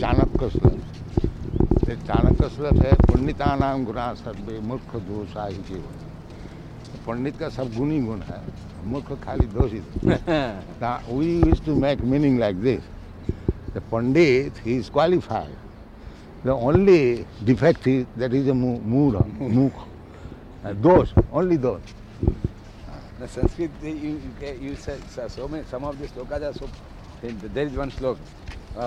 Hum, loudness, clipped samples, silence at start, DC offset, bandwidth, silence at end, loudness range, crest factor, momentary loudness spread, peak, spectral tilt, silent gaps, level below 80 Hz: none; -23 LUFS; under 0.1%; 0 s; under 0.1%; 9.6 kHz; 0 s; 11 LU; 20 dB; 21 LU; -2 dBFS; -8.5 dB/octave; none; -32 dBFS